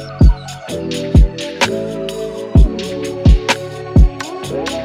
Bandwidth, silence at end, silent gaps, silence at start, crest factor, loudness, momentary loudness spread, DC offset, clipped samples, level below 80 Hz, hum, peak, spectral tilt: 12.5 kHz; 0 s; none; 0 s; 14 dB; -16 LUFS; 10 LU; under 0.1%; under 0.1%; -16 dBFS; none; 0 dBFS; -6 dB/octave